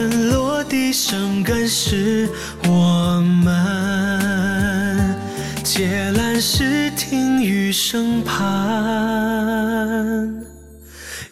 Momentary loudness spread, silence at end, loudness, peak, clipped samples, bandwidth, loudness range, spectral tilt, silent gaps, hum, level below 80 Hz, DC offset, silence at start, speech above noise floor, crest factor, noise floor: 6 LU; 0.05 s; -18 LUFS; -4 dBFS; under 0.1%; 16 kHz; 2 LU; -4.5 dB/octave; none; none; -38 dBFS; 0.4%; 0 s; 21 dB; 14 dB; -40 dBFS